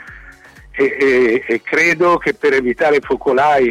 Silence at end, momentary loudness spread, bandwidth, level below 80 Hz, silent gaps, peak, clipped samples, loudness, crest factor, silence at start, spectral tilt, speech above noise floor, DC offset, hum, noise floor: 0 s; 6 LU; 13 kHz; -46 dBFS; none; -6 dBFS; under 0.1%; -14 LUFS; 10 dB; 0 s; -5 dB/octave; 26 dB; under 0.1%; none; -40 dBFS